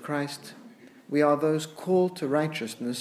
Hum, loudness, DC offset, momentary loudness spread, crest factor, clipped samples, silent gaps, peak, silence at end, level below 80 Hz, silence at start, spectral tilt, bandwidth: none; -27 LUFS; under 0.1%; 11 LU; 18 dB; under 0.1%; none; -10 dBFS; 0 s; -82 dBFS; 0 s; -5.5 dB/octave; 15 kHz